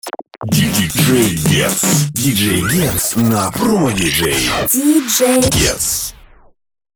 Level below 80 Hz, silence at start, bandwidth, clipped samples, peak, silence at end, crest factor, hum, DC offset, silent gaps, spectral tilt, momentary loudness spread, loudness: -34 dBFS; 0.05 s; over 20 kHz; under 0.1%; 0 dBFS; 0.8 s; 14 dB; none; under 0.1%; none; -4 dB/octave; 4 LU; -13 LUFS